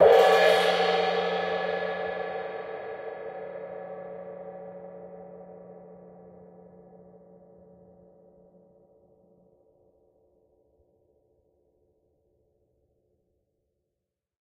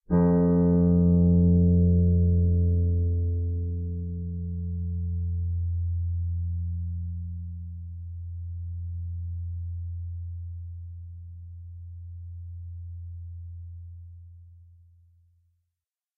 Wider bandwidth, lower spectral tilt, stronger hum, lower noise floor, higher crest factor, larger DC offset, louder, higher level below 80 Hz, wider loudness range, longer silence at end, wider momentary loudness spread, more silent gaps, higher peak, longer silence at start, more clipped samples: first, 15.5 kHz vs 2 kHz; second, -3.5 dB/octave vs -12.5 dB/octave; neither; about the same, -86 dBFS vs -87 dBFS; first, 24 dB vs 16 dB; neither; about the same, -26 LUFS vs -26 LUFS; second, -68 dBFS vs -38 dBFS; first, 27 LU vs 20 LU; first, 8 s vs 1.55 s; first, 27 LU vs 22 LU; neither; first, -6 dBFS vs -12 dBFS; about the same, 0 s vs 0.1 s; neither